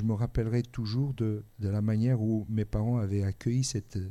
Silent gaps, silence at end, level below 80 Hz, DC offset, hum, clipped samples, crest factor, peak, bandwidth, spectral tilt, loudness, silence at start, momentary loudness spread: none; 0 s; -46 dBFS; under 0.1%; none; under 0.1%; 12 dB; -16 dBFS; 12 kHz; -7 dB/octave; -30 LUFS; 0 s; 6 LU